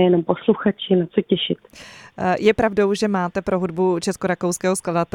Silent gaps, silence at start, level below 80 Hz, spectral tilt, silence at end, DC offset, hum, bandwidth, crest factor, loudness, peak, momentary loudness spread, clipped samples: none; 0 s; -50 dBFS; -5.5 dB/octave; 0.1 s; under 0.1%; none; 16.5 kHz; 18 dB; -20 LUFS; -2 dBFS; 8 LU; under 0.1%